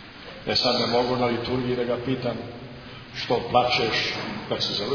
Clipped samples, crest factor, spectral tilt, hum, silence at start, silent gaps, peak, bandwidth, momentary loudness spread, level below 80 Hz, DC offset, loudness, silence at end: under 0.1%; 20 dB; -5 dB/octave; none; 0 s; none; -4 dBFS; 5.4 kHz; 16 LU; -52 dBFS; under 0.1%; -24 LUFS; 0 s